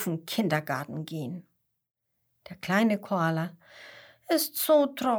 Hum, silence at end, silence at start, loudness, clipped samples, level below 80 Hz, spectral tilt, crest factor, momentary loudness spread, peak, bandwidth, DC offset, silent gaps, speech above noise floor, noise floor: none; 0 s; 0 s; -28 LUFS; under 0.1%; -74 dBFS; -5 dB/octave; 20 dB; 24 LU; -10 dBFS; over 20 kHz; under 0.1%; none; 49 dB; -76 dBFS